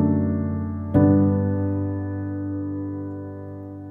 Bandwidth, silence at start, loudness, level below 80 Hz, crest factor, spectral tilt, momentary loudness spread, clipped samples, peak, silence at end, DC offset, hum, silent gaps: 2.2 kHz; 0 s; -23 LUFS; -48 dBFS; 18 dB; -13 dB/octave; 17 LU; under 0.1%; -6 dBFS; 0 s; under 0.1%; none; none